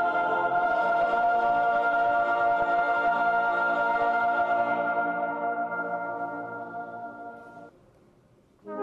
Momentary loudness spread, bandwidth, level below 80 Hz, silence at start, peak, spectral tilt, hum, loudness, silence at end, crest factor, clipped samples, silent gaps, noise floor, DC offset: 13 LU; 6 kHz; -64 dBFS; 0 s; -16 dBFS; -6 dB/octave; none; -25 LUFS; 0 s; 10 dB; under 0.1%; none; -60 dBFS; under 0.1%